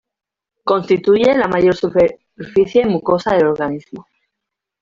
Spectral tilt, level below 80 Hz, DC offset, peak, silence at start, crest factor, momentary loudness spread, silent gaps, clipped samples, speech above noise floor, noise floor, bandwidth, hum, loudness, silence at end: -7 dB/octave; -50 dBFS; under 0.1%; -2 dBFS; 0.65 s; 14 dB; 10 LU; none; under 0.1%; 70 dB; -84 dBFS; 7.4 kHz; none; -15 LUFS; 0.8 s